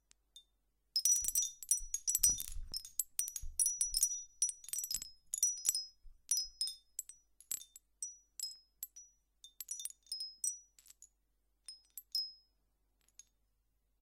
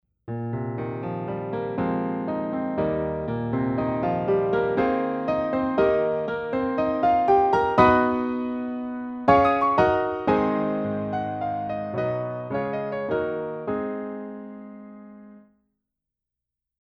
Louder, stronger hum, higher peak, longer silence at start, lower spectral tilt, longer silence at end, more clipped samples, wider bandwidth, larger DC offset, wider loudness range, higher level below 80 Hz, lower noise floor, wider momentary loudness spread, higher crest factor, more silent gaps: second, -36 LUFS vs -24 LUFS; neither; second, -10 dBFS vs -4 dBFS; about the same, 0.35 s vs 0.25 s; second, 2.5 dB/octave vs -8.5 dB/octave; first, 1.65 s vs 1.4 s; neither; first, 16.5 kHz vs 6.6 kHz; neither; first, 12 LU vs 9 LU; second, -58 dBFS vs -50 dBFS; second, -80 dBFS vs -87 dBFS; first, 19 LU vs 12 LU; first, 30 dB vs 20 dB; neither